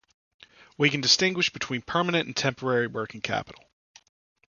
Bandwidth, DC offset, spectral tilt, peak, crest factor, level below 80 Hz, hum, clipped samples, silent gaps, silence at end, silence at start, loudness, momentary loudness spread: 10 kHz; under 0.1%; -3.5 dB/octave; -4 dBFS; 24 dB; -62 dBFS; none; under 0.1%; none; 1 s; 0.8 s; -25 LUFS; 12 LU